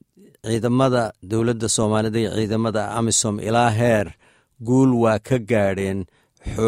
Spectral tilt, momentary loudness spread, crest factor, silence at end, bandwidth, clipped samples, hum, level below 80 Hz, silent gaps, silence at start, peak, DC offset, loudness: -5 dB/octave; 13 LU; 16 dB; 0 s; 15.5 kHz; under 0.1%; none; -46 dBFS; none; 0.45 s; -4 dBFS; under 0.1%; -20 LUFS